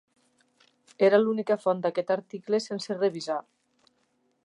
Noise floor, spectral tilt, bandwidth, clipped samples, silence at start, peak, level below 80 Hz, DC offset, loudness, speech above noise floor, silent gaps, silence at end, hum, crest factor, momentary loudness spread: -72 dBFS; -5.5 dB/octave; 11 kHz; under 0.1%; 1 s; -8 dBFS; -84 dBFS; under 0.1%; -27 LUFS; 46 dB; none; 1.05 s; none; 20 dB; 11 LU